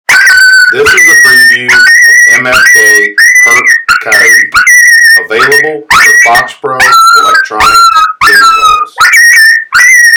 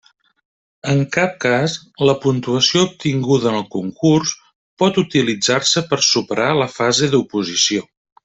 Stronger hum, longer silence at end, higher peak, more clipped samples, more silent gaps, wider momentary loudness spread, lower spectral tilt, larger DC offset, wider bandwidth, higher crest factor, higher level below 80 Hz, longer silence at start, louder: neither; second, 0 s vs 0.45 s; about the same, 0 dBFS vs 0 dBFS; first, 8% vs under 0.1%; second, none vs 4.55-4.77 s; about the same, 5 LU vs 6 LU; second, 0.5 dB/octave vs -4 dB/octave; neither; first, over 20 kHz vs 8.4 kHz; second, 4 dB vs 18 dB; first, -38 dBFS vs -56 dBFS; second, 0.1 s vs 0.85 s; first, -1 LUFS vs -17 LUFS